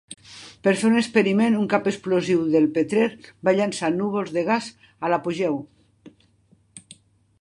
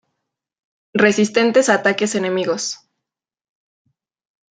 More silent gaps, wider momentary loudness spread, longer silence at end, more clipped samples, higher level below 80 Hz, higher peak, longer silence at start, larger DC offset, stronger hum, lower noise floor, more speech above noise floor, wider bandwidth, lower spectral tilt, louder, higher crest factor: neither; about the same, 9 LU vs 11 LU; second, 0.5 s vs 1.75 s; neither; about the same, -66 dBFS vs -66 dBFS; second, -4 dBFS vs 0 dBFS; second, 0.1 s vs 0.95 s; neither; neither; second, -60 dBFS vs -82 dBFS; second, 39 dB vs 66 dB; first, 11.5 kHz vs 9.6 kHz; first, -5.5 dB/octave vs -3.5 dB/octave; second, -22 LUFS vs -17 LUFS; about the same, 20 dB vs 20 dB